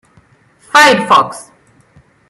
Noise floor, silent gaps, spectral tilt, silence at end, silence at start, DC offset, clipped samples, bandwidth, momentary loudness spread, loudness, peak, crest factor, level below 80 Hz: -49 dBFS; none; -2.5 dB/octave; 0.85 s; 0.75 s; under 0.1%; under 0.1%; 16 kHz; 15 LU; -9 LUFS; 0 dBFS; 14 dB; -58 dBFS